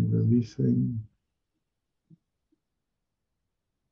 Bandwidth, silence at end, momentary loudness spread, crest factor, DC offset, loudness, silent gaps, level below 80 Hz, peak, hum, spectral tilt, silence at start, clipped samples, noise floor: 6.6 kHz; 2.85 s; 8 LU; 18 dB; under 0.1%; -26 LUFS; none; -62 dBFS; -14 dBFS; none; -10.5 dB/octave; 0 s; under 0.1%; -84 dBFS